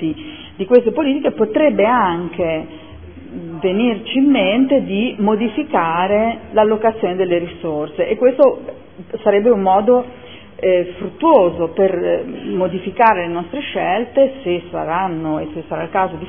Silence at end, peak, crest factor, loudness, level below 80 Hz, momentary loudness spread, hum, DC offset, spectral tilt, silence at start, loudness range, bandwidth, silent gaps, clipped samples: 0 s; 0 dBFS; 16 dB; -16 LUFS; -50 dBFS; 12 LU; none; 0.6%; -10 dB/octave; 0 s; 2 LU; 3.6 kHz; none; under 0.1%